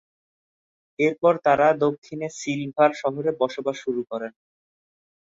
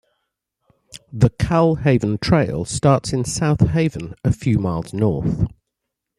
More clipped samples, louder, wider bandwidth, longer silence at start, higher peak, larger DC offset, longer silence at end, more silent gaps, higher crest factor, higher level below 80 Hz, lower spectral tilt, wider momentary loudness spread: neither; second, -23 LUFS vs -19 LUFS; second, 8 kHz vs 12.5 kHz; about the same, 1 s vs 0.95 s; second, -6 dBFS vs -2 dBFS; neither; first, 0.9 s vs 0.7 s; first, 1.98-2.02 s vs none; about the same, 18 dB vs 18 dB; second, -68 dBFS vs -38 dBFS; about the same, -5.5 dB/octave vs -6.5 dB/octave; first, 14 LU vs 7 LU